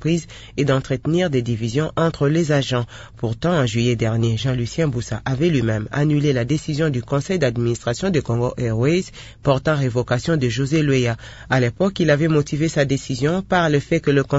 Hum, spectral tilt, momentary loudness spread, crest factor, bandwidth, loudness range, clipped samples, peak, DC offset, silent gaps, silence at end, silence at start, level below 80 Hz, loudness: none; -6.5 dB/octave; 5 LU; 16 dB; 8 kHz; 2 LU; under 0.1%; -4 dBFS; under 0.1%; none; 0 s; 0 s; -42 dBFS; -20 LUFS